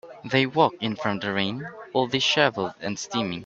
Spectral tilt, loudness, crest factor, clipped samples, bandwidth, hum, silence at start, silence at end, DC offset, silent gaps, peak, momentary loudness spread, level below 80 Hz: -4 dB/octave; -24 LUFS; 22 dB; under 0.1%; 8 kHz; none; 0.05 s; 0 s; under 0.1%; none; -2 dBFS; 10 LU; -64 dBFS